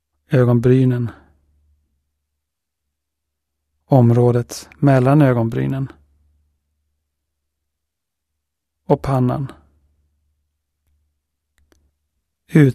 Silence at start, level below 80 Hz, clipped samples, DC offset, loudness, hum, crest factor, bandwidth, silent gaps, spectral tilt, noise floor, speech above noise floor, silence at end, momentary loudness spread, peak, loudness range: 0.3 s; -48 dBFS; under 0.1%; under 0.1%; -16 LUFS; none; 20 dB; 13.5 kHz; none; -8.5 dB/octave; -81 dBFS; 66 dB; 0 s; 13 LU; 0 dBFS; 12 LU